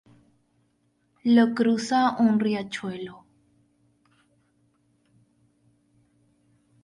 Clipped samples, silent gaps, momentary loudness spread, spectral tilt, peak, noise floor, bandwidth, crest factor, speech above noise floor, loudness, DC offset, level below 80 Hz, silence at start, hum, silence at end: under 0.1%; none; 15 LU; -5.5 dB/octave; -8 dBFS; -69 dBFS; 11 kHz; 20 dB; 47 dB; -23 LUFS; under 0.1%; -72 dBFS; 1.25 s; none; 3.7 s